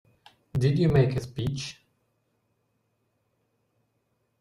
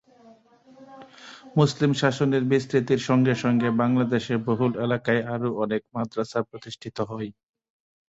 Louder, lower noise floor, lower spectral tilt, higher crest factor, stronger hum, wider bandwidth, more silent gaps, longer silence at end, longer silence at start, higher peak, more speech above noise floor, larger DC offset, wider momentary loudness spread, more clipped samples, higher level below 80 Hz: about the same, -26 LUFS vs -24 LUFS; first, -74 dBFS vs -54 dBFS; about the same, -7.5 dB/octave vs -6.5 dB/octave; about the same, 20 dB vs 20 dB; neither; first, 11.5 kHz vs 8 kHz; neither; first, 2.7 s vs 0.8 s; second, 0.55 s vs 0.8 s; second, -10 dBFS vs -6 dBFS; first, 50 dB vs 30 dB; neither; about the same, 13 LU vs 14 LU; neither; first, -52 dBFS vs -62 dBFS